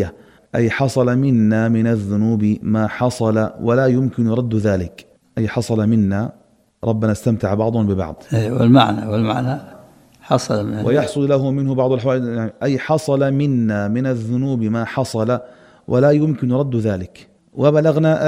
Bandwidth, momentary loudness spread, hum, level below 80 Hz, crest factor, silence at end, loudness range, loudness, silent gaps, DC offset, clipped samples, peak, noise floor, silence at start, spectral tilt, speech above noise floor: 13 kHz; 8 LU; none; -50 dBFS; 18 dB; 0 s; 2 LU; -18 LUFS; none; under 0.1%; under 0.1%; 0 dBFS; -45 dBFS; 0 s; -7.5 dB/octave; 29 dB